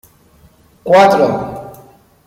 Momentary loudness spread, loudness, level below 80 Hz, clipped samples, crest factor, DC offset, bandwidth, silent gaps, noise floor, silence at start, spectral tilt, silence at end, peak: 21 LU; -11 LUFS; -50 dBFS; under 0.1%; 14 dB; under 0.1%; 16 kHz; none; -48 dBFS; 0.85 s; -5.5 dB/octave; 0.55 s; 0 dBFS